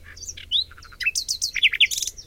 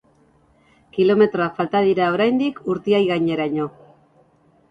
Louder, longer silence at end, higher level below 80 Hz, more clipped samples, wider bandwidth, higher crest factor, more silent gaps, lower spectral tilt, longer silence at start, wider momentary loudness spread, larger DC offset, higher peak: about the same, -21 LUFS vs -19 LUFS; second, 0.05 s vs 1 s; first, -50 dBFS vs -60 dBFS; neither; first, 17 kHz vs 7.4 kHz; about the same, 18 dB vs 16 dB; neither; second, 3 dB/octave vs -8 dB/octave; second, 0.05 s vs 0.95 s; first, 17 LU vs 9 LU; neither; about the same, -6 dBFS vs -4 dBFS